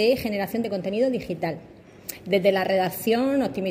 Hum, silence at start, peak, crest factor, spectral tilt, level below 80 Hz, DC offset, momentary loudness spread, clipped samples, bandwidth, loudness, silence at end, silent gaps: none; 0 s; -8 dBFS; 16 dB; -5.5 dB/octave; -58 dBFS; under 0.1%; 14 LU; under 0.1%; 16 kHz; -24 LUFS; 0 s; none